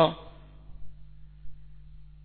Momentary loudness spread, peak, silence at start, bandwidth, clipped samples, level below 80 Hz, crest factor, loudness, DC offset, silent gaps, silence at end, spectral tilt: 11 LU; -8 dBFS; 0 s; 4.4 kHz; under 0.1%; -50 dBFS; 26 dB; -29 LUFS; under 0.1%; none; 0 s; -9.5 dB/octave